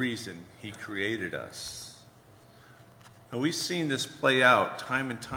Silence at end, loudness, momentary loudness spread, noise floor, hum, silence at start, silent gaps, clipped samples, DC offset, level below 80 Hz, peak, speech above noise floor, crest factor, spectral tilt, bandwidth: 0 s; -28 LUFS; 20 LU; -56 dBFS; none; 0 s; none; under 0.1%; under 0.1%; -68 dBFS; -8 dBFS; 26 dB; 22 dB; -3.5 dB/octave; over 20 kHz